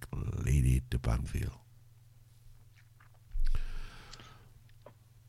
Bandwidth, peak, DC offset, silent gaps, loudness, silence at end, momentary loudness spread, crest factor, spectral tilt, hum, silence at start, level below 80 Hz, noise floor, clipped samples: 14 kHz; -16 dBFS; under 0.1%; none; -34 LUFS; 0.4 s; 22 LU; 18 dB; -6.5 dB/octave; none; 0 s; -36 dBFS; -59 dBFS; under 0.1%